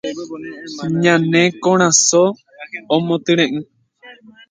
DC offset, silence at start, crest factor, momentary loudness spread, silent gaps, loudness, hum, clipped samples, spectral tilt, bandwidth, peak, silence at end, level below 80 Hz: under 0.1%; 0.05 s; 18 dB; 19 LU; none; -15 LUFS; none; under 0.1%; -3.5 dB/octave; 10 kHz; 0 dBFS; 0.35 s; -62 dBFS